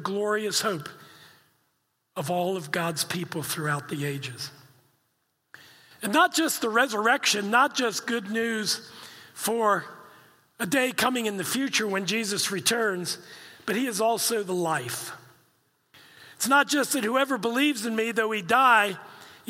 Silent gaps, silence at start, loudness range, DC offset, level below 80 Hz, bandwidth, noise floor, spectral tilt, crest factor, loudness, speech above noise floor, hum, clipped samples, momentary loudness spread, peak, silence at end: none; 0 s; 7 LU; under 0.1%; -76 dBFS; 16.5 kHz; -74 dBFS; -3 dB/octave; 20 dB; -25 LUFS; 48 dB; none; under 0.1%; 14 LU; -6 dBFS; 0.15 s